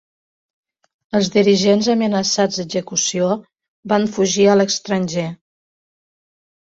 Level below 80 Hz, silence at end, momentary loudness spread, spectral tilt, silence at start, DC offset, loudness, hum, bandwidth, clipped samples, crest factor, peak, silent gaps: -60 dBFS; 1.3 s; 9 LU; -4 dB/octave; 1.15 s; under 0.1%; -17 LUFS; none; 7.8 kHz; under 0.1%; 16 dB; -2 dBFS; 3.68-3.83 s